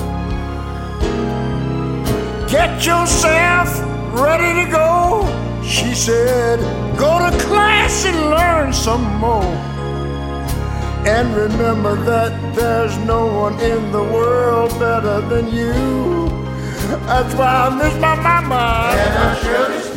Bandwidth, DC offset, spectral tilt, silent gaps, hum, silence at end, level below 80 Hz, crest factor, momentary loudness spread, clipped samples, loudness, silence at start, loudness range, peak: 16.5 kHz; under 0.1%; -5 dB/octave; none; none; 0 s; -26 dBFS; 16 dB; 9 LU; under 0.1%; -16 LUFS; 0 s; 3 LU; 0 dBFS